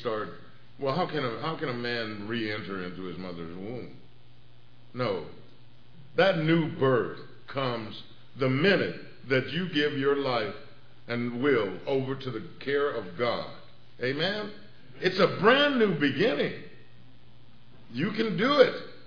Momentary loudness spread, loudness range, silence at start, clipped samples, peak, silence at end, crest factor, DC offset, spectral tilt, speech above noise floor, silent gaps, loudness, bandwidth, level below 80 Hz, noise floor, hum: 16 LU; 9 LU; 0 s; under 0.1%; -6 dBFS; 0.1 s; 24 dB; 0.7%; -7 dB/octave; 29 dB; none; -28 LUFS; 5.4 kHz; -68 dBFS; -57 dBFS; none